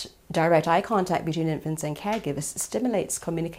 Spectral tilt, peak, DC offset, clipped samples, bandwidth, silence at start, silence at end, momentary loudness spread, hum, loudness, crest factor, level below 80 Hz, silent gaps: -5 dB/octave; -8 dBFS; under 0.1%; under 0.1%; 16 kHz; 0 s; 0 s; 8 LU; none; -26 LUFS; 18 dB; -56 dBFS; none